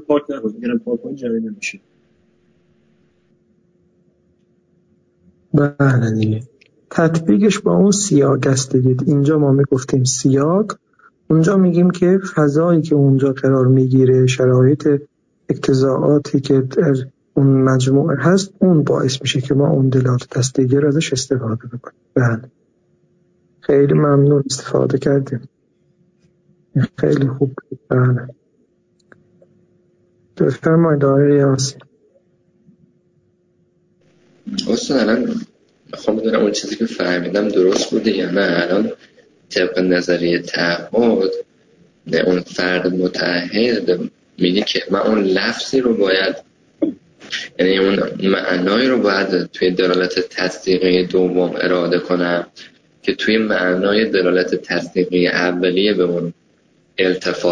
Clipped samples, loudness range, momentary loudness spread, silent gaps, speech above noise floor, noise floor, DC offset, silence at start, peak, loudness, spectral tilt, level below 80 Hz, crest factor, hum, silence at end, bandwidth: under 0.1%; 7 LU; 10 LU; none; 44 dB; -60 dBFS; under 0.1%; 0 s; -2 dBFS; -16 LUFS; -6 dB/octave; -54 dBFS; 14 dB; none; 0 s; 10 kHz